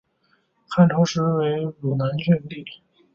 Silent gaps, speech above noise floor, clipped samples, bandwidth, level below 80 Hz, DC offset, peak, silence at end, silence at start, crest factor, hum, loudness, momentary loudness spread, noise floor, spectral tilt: none; 45 dB; under 0.1%; 7.2 kHz; -60 dBFS; under 0.1%; -4 dBFS; 0.4 s; 0.7 s; 18 dB; none; -21 LUFS; 17 LU; -66 dBFS; -7 dB/octave